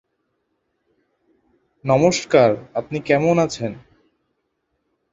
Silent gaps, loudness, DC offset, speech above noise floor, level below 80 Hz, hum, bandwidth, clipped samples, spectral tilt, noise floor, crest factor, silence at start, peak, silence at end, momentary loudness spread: none; -18 LUFS; under 0.1%; 55 dB; -56 dBFS; none; 7.8 kHz; under 0.1%; -5.5 dB/octave; -72 dBFS; 20 dB; 1.85 s; -2 dBFS; 1.35 s; 12 LU